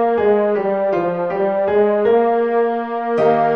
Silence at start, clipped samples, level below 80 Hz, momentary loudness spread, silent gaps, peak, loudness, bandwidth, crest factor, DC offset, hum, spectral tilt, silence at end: 0 s; under 0.1%; -56 dBFS; 5 LU; none; -4 dBFS; -17 LUFS; 5.4 kHz; 12 dB; 0.2%; none; -8.5 dB/octave; 0 s